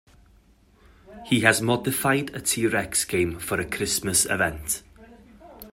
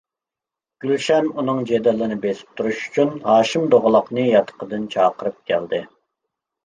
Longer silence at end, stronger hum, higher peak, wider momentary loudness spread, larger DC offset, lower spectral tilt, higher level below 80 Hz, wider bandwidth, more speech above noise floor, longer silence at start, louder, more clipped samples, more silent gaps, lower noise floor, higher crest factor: second, 0.05 s vs 0.8 s; neither; about the same, -2 dBFS vs -2 dBFS; about the same, 9 LU vs 10 LU; neither; second, -3 dB/octave vs -5.5 dB/octave; first, -50 dBFS vs -62 dBFS; first, 16 kHz vs 9.6 kHz; second, 33 dB vs 69 dB; first, 1.1 s vs 0.85 s; second, -23 LUFS vs -19 LUFS; neither; neither; second, -57 dBFS vs -88 dBFS; first, 24 dB vs 18 dB